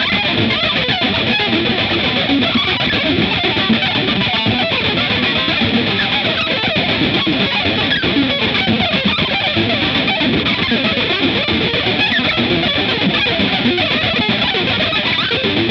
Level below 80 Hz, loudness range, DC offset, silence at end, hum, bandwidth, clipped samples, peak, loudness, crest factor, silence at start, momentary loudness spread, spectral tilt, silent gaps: -40 dBFS; 0 LU; under 0.1%; 0 s; none; 7.4 kHz; under 0.1%; -2 dBFS; -14 LUFS; 14 dB; 0 s; 1 LU; -6 dB/octave; none